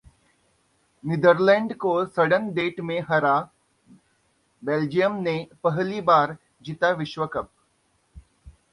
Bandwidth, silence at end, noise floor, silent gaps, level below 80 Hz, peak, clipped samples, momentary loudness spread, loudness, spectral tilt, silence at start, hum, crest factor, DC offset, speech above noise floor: 11 kHz; 0.25 s; -67 dBFS; none; -60 dBFS; -4 dBFS; under 0.1%; 14 LU; -23 LUFS; -7 dB/octave; 1.05 s; none; 20 dB; under 0.1%; 45 dB